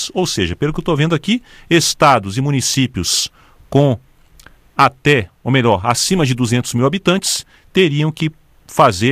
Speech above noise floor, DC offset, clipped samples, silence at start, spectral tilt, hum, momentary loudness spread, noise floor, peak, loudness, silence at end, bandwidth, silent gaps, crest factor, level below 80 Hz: 30 dB; under 0.1%; under 0.1%; 0 s; -4.5 dB/octave; none; 8 LU; -45 dBFS; 0 dBFS; -15 LUFS; 0 s; 15.5 kHz; none; 16 dB; -42 dBFS